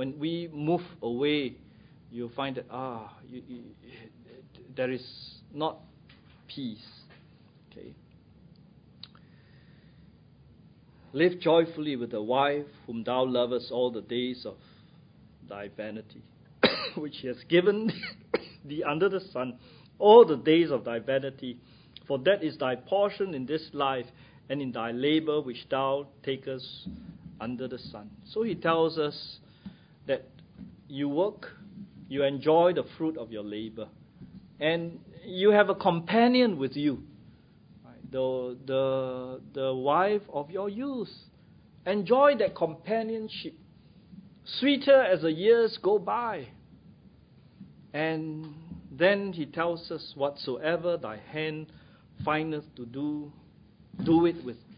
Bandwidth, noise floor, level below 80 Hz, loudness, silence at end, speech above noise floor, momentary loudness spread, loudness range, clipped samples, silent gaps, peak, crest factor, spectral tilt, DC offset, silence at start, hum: 5.2 kHz; -57 dBFS; -64 dBFS; -28 LUFS; 0.05 s; 29 dB; 21 LU; 14 LU; under 0.1%; none; -4 dBFS; 26 dB; -10 dB/octave; under 0.1%; 0 s; none